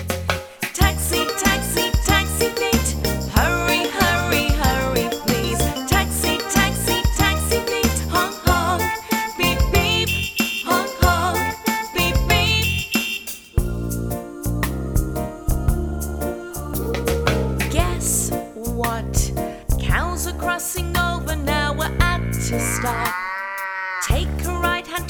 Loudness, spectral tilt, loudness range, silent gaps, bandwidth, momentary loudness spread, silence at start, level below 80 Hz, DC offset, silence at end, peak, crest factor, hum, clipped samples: -20 LUFS; -4 dB/octave; 4 LU; none; over 20 kHz; 8 LU; 0 s; -26 dBFS; under 0.1%; 0 s; -2 dBFS; 20 dB; none; under 0.1%